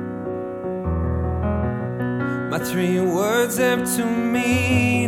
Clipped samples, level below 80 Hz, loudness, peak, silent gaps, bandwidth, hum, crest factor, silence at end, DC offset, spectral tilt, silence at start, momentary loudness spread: under 0.1%; -36 dBFS; -22 LUFS; -6 dBFS; none; 17 kHz; none; 16 dB; 0 s; under 0.1%; -5.5 dB/octave; 0 s; 9 LU